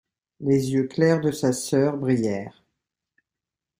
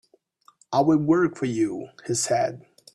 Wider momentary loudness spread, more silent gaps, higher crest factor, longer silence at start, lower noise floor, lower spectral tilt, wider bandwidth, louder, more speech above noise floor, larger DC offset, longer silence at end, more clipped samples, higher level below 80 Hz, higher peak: about the same, 9 LU vs 9 LU; neither; about the same, 18 dB vs 16 dB; second, 0.4 s vs 0.7 s; first, -88 dBFS vs -59 dBFS; first, -6.5 dB/octave vs -5 dB/octave; first, 16 kHz vs 12.5 kHz; about the same, -23 LUFS vs -23 LUFS; first, 66 dB vs 37 dB; neither; first, 1.3 s vs 0.35 s; neither; about the same, -62 dBFS vs -64 dBFS; about the same, -6 dBFS vs -8 dBFS